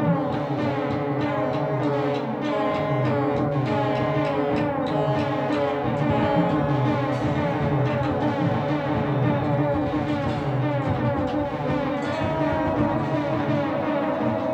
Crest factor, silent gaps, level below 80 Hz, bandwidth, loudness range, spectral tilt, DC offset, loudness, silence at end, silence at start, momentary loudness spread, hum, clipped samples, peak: 14 dB; none; -48 dBFS; 8.2 kHz; 1 LU; -8.5 dB/octave; under 0.1%; -24 LUFS; 0 s; 0 s; 3 LU; none; under 0.1%; -10 dBFS